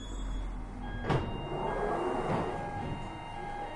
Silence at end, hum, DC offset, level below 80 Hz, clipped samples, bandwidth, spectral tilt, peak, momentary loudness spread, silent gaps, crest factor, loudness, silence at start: 0 s; none; under 0.1%; -42 dBFS; under 0.1%; 11 kHz; -6.5 dB/octave; -16 dBFS; 9 LU; none; 18 dB; -36 LUFS; 0 s